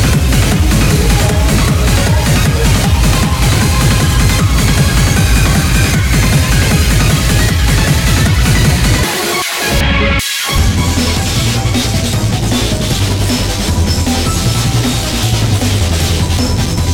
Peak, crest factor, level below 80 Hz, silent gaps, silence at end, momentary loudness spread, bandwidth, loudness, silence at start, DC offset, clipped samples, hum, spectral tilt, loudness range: -2 dBFS; 10 dB; -16 dBFS; none; 0 s; 3 LU; 18 kHz; -11 LUFS; 0 s; under 0.1%; under 0.1%; none; -4.5 dB/octave; 3 LU